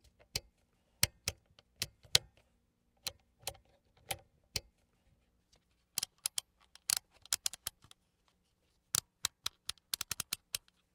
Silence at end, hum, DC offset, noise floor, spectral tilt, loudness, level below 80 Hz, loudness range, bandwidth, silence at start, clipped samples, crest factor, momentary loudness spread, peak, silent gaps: 0.35 s; none; under 0.1%; -77 dBFS; 0 dB/octave; -38 LUFS; -66 dBFS; 8 LU; 18 kHz; 0.35 s; under 0.1%; 38 dB; 12 LU; -4 dBFS; none